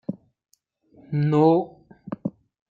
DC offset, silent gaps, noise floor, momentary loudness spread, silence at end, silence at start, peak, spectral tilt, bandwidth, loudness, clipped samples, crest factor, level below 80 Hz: under 0.1%; none; -60 dBFS; 20 LU; 0.4 s; 0.1 s; -6 dBFS; -10 dB/octave; 7.2 kHz; -23 LUFS; under 0.1%; 20 dB; -66 dBFS